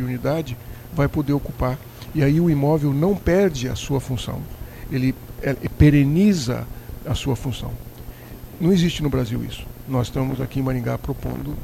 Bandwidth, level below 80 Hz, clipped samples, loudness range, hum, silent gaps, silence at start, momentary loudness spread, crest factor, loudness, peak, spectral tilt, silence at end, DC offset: 16 kHz; -34 dBFS; under 0.1%; 3 LU; none; none; 0 s; 17 LU; 18 dB; -22 LUFS; -4 dBFS; -7 dB/octave; 0 s; under 0.1%